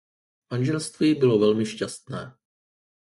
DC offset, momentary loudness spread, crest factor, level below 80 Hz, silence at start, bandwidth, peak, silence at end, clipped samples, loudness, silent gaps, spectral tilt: under 0.1%; 17 LU; 18 dB; -64 dBFS; 0.5 s; 11.5 kHz; -8 dBFS; 0.85 s; under 0.1%; -23 LUFS; none; -6 dB/octave